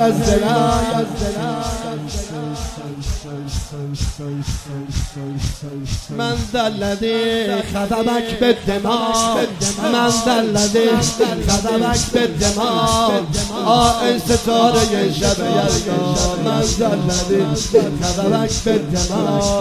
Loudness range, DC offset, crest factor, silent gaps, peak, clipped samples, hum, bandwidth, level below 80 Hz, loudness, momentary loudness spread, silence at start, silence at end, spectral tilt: 10 LU; under 0.1%; 16 dB; none; 0 dBFS; under 0.1%; none; 15.5 kHz; -30 dBFS; -18 LUFS; 11 LU; 0 s; 0 s; -4.5 dB/octave